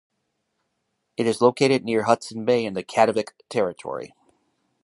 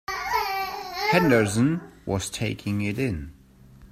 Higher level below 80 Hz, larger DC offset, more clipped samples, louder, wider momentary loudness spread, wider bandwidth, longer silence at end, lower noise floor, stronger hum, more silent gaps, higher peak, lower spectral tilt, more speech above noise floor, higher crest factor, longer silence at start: second, -68 dBFS vs -50 dBFS; neither; neither; first, -22 LUFS vs -25 LUFS; first, 14 LU vs 11 LU; second, 11.5 kHz vs 16 kHz; first, 0.8 s vs 0.05 s; first, -76 dBFS vs -50 dBFS; neither; neither; first, -2 dBFS vs -6 dBFS; about the same, -5 dB/octave vs -5.5 dB/octave; first, 54 dB vs 27 dB; about the same, 22 dB vs 20 dB; first, 1.2 s vs 0.1 s